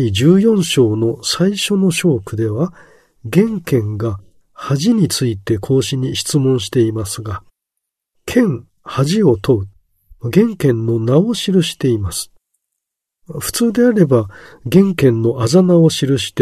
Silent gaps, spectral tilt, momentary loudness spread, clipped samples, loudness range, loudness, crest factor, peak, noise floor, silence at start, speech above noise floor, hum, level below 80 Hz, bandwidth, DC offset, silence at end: none; -6 dB/octave; 13 LU; under 0.1%; 3 LU; -15 LUFS; 16 dB; 0 dBFS; -78 dBFS; 0 s; 64 dB; none; -46 dBFS; 13.5 kHz; under 0.1%; 0 s